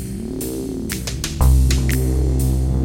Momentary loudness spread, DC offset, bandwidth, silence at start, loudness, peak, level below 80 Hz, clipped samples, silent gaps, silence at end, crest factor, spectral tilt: 10 LU; under 0.1%; 17 kHz; 0 s; -20 LUFS; -2 dBFS; -20 dBFS; under 0.1%; none; 0 s; 16 dB; -5.5 dB/octave